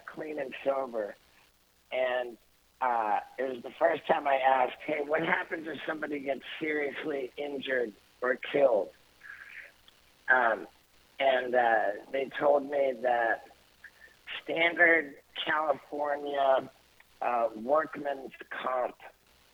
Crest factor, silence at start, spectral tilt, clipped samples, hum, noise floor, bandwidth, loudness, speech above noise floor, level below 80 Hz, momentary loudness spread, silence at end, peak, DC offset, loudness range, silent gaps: 22 dB; 0.05 s; -5 dB/octave; under 0.1%; none; -65 dBFS; 17 kHz; -30 LUFS; 36 dB; -74 dBFS; 15 LU; 0.45 s; -10 dBFS; under 0.1%; 5 LU; none